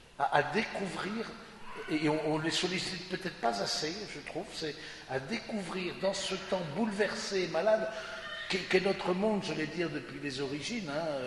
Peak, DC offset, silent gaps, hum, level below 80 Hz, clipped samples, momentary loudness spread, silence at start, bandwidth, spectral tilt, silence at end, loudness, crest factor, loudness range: -10 dBFS; under 0.1%; none; none; -62 dBFS; under 0.1%; 10 LU; 0 s; 11.5 kHz; -4 dB/octave; 0 s; -33 LUFS; 24 dB; 4 LU